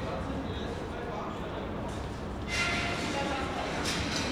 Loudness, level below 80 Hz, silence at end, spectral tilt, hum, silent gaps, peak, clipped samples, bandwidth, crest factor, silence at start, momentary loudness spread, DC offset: -33 LUFS; -44 dBFS; 0 s; -4 dB/octave; none; none; -18 dBFS; under 0.1%; 18.5 kHz; 16 dB; 0 s; 8 LU; under 0.1%